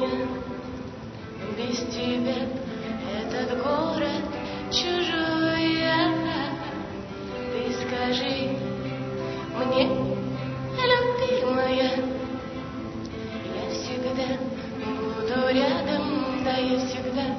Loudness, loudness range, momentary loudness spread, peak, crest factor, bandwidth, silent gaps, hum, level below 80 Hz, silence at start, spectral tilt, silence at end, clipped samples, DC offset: -27 LUFS; 5 LU; 12 LU; -8 dBFS; 20 dB; 6.4 kHz; none; none; -50 dBFS; 0 s; -5.5 dB/octave; 0 s; under 0.1%; under 0.1%